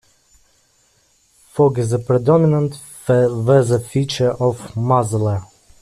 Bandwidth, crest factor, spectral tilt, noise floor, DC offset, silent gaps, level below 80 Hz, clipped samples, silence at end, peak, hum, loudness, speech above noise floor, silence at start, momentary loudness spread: 14 kHz; 14 dB; -7 dB/octave; -58 dBFS; under 0.1%; none; -52 dBFS; under 0.1%; 0.4 s; -2 dBFS; none; -17 LUFS; 42 dB; 1.55 s; 9 LU